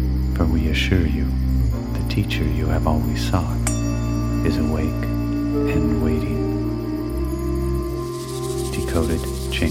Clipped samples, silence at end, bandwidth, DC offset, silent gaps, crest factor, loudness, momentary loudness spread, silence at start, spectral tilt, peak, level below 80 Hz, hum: under 0.1%; 0 s; 16 kHz; under 0.1%; none; 16 dB; -22 LUFS; 5 LU; 0 s; -6.5 dB/octave; -4 dBFS; -26 dBFS; none